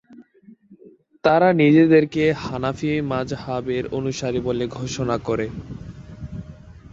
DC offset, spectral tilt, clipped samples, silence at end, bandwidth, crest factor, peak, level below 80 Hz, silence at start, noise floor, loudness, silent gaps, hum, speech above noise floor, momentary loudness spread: under 0.1%; -6.5 dB/octave; under 0.1%; 0.05 s; 7.8 kHz; 18 dB; -4 dBFS; -46 dBFS; 0.1 s; -50 dBFS; -20 LUFS; none; none; 31 dB; 22 LU